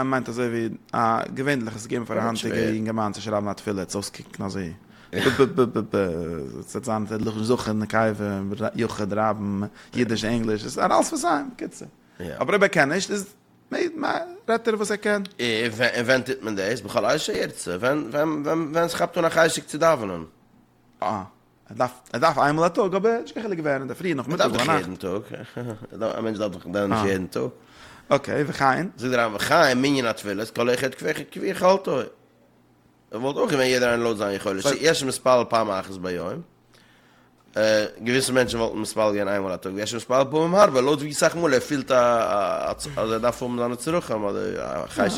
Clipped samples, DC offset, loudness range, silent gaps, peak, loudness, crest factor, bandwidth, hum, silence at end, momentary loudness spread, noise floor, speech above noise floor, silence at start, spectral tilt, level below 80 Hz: under 0.1%; under 0.1%; 4 LU; none; -2 dBFS; -24 LUFS; 20 dB; 17 kHz; none; 0 s; 11 LU; -58 dBFS; 35 dB; 0 s; -4.5 dB/octave; -56 dBFS